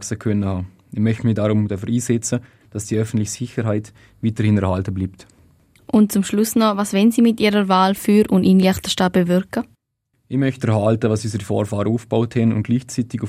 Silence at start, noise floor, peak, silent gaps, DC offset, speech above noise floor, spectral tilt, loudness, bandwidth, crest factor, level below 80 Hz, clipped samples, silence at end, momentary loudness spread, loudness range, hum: 0 s; -70 dBFS; -4 dBFS; none; under 0.1%; 52 dB; -6 dB/octave; -19 LUFS; 16 kHz; 14 dB; -54 dBFS; under 0.1%; 0 s; 10 LU; 6 LU; none